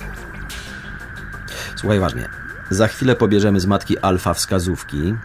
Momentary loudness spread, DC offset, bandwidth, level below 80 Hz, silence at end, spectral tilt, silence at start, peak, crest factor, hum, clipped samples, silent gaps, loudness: 16 LU; under 0.1%; 16 kHz; -36 dBFS; 0 s; -5.5 dB/octave; 0 s; -4 dBFS; 16 dB; none; under 0.1%; none; -19 LUFS